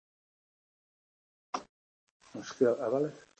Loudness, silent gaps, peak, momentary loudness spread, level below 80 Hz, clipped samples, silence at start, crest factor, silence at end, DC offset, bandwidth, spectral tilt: -32 LUFS; 1.69-2.20 s; -14 dBFS; 16 LU; -82 dBFS; under 0.1%; 1.55 s; 22 dB; 0.2 s; under 0.1%; 8.6 kHz; -6 dB/octave